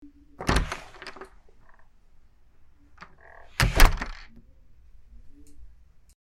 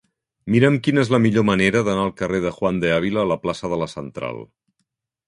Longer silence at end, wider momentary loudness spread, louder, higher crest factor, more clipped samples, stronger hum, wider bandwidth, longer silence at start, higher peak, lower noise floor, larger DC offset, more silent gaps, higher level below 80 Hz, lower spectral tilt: second, 0.55 s vs 0.85 s; first, 29 LU vs 13 LU; second, -26 LUFS vs -20 LUFS; first, 26 dB vs 18 dB; neither; neither; first, 16.5 kHz vs 11 kHz; about the same, 0.4 s vs 0.45 s; about the same, -2 dBFS vs -2 dBFS; second, -53 dBFS vs -75 dBFS; neither; neither; first, -30 dBFS vs -50 dBFS; second, -4 dB/octave vs -6.5 dB/octave